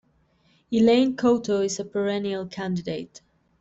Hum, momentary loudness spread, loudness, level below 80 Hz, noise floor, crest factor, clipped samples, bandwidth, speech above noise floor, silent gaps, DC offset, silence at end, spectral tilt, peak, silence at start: none; 12 LU; -24 LUFS; -62 dBFS; -64 dBFS; 16 dB; under 0.1%; 8 kHz; 40 dB; none; under 0.1%; 0.4 s; -5.5 dB/octave; -8 dBFS; 0.7 s